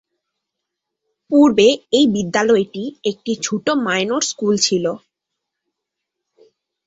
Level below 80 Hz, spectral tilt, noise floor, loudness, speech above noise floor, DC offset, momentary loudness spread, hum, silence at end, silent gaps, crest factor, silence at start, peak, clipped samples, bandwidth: -60 dBFS; -3.5 dB/octave; -80 dBFS; -17 LUFS; 64 dB; under 0.1%; 11 LU; none; 1.9 s; none; 18 dB; 1.3 s; -2 dBFS; under 0.1%; 8 kHz